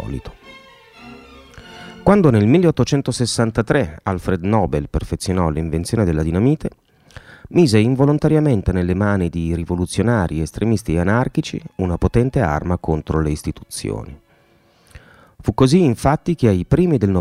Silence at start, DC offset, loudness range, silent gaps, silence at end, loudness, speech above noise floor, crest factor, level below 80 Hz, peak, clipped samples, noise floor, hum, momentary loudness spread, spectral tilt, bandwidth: 0 s; under 0.1%; 4 LU; none; 0 s; -18 LUFS; 38 dB; 18 dB; -34 dBFS; 0 dBFS; under 0.1%; -55 dBFS; none; 12 LU; -7 dB/octave; 14.5 kHz